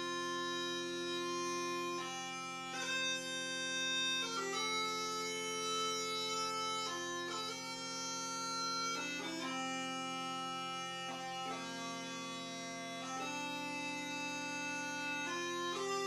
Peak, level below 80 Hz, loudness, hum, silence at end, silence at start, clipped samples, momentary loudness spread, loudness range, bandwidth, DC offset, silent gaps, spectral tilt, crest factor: -24 dBFS; -82 dBFS; -39 LUFS; none; 0 s; 0 s; under 0.1%; 6 LU; 5 LU; 15.5 kHz; under 0.1%; none; -1.5 dB/octave; 16 dB